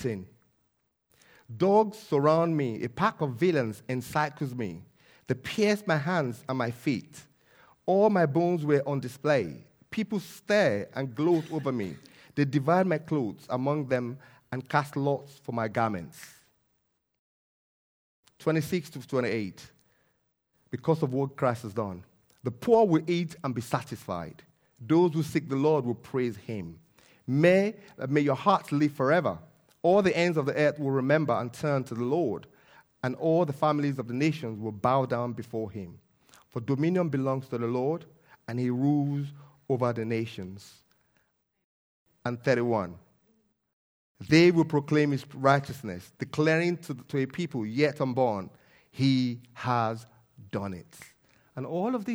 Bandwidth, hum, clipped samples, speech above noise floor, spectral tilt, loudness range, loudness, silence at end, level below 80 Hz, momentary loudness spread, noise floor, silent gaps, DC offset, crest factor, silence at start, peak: over 20 kHz; none; under 0.1%; 49 dB; -7 dB/octave; 7 LU; -28 LUFS; 0 s; -68 dBFS; 14 LU; -76 dBFS; 17.19-18.23 s, 41.64-42.06 s, 43.73-44.15 s; under 0.1%; 22 dB; 0 s; -6 dBFS